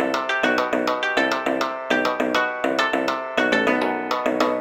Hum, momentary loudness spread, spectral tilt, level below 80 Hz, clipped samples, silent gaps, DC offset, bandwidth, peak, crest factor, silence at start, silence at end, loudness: none; 4 LU; -3.5 dB/octave; -62 dBFS; under 0.1%; none; under 0.1%; 16.5 kHz; -4 dBFS; 16 dB; 0 s; 0 s; -21 LUFS